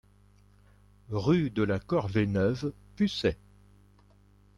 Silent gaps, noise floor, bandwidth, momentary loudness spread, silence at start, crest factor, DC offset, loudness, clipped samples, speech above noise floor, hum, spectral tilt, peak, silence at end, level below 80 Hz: none; -60 dBFS; 11 kHz; 9 LU; 1.1 s; 18 dB; under 0.1%; -29 LUFS; under 0.1%; 32 dB; 50 Hz at -45 dBFS; -7.5 dB/octave; -14 dBFS; 1.25 s; -54 dBFS